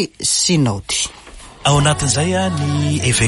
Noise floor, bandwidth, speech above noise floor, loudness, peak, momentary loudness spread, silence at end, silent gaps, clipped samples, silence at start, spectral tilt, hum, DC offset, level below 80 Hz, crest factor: -38 dBFS; 11.5 kHz; 22 dB; -16 LUFS; -2 dBFS; 6 LU; 0 s; none; under 0.1%; 0 s; -3.5 dB/octave; none; under 0.1%; -38 dBFS; 14 dB